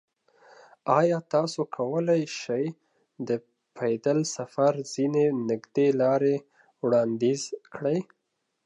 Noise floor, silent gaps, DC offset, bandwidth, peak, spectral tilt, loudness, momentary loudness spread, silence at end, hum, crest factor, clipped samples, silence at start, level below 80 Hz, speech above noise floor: -58 dBFS; none; under 0.1%; 10.5 kHz; -6 dBFS; -6 dB/octave; -27 LUFS; 9 LU; 0.6 s; none; 20 dB; under 0.1%; 0.85 s; -78 dBFS; 32 dB